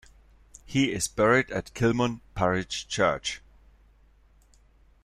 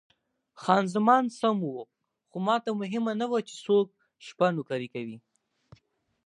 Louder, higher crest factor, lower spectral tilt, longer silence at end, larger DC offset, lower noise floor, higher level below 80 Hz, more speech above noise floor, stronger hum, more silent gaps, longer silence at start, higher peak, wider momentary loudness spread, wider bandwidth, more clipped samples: about the same, -26 LUFS vs -28 LUFS; about the same, 20 dB vs 22 dB; second, -4.5 dB/octave vs -6 dB/octave; first, 1.65 s vs 1.05 s; neither; second, -59 dBFS vs -71 dBFS; first, -52 dBFS vs -78 dBFS; second, 33 dB vs 44 dB; neither; neither; about the same, 0.7 s vs 0.6 s; about the same, -8 dBFS vs -6 dBFS; second, 10 LU vs 17 LU; first, 14 kHz vs 11 kHz; neither